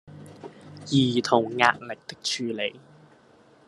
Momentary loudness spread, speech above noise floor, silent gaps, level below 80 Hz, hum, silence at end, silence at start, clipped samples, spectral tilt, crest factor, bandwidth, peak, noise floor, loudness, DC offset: 22 LU; 32 dB; none; -68 dBFS; none; 0.9 s; 0.05 s; under 0.1%; -4.5 dB/octave; 26 dB; 12 kHz; -2 dBFS; -56 dBFS; -24 LUFS; under 0.1%